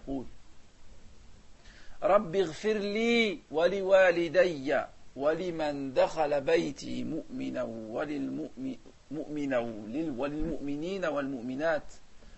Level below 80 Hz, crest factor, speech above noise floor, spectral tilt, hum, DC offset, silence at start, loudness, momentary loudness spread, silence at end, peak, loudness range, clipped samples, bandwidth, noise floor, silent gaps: -52 dBFS; 18 dB; 21 dB; -5.5 dB/octave; none; under 0.1%; 0 s; -30 LUFS; 12 LU; 0 s; -12 dBFS; 8 LU; under 0.1%; 8.4 kHz; -50 dBFS; none